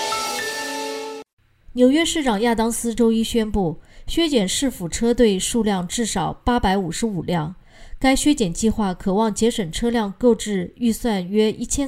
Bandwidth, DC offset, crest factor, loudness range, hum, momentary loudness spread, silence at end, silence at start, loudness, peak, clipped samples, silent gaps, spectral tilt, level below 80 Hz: 16 kHz; under 0.1%; 18 dB; 1 LU; none; 8 LU; 0 s; 0 s; -21 LUFS; -4 dBFS; under 0.1%; 1.33-1.37 s; -4.5 dB/octave; -38 dBFS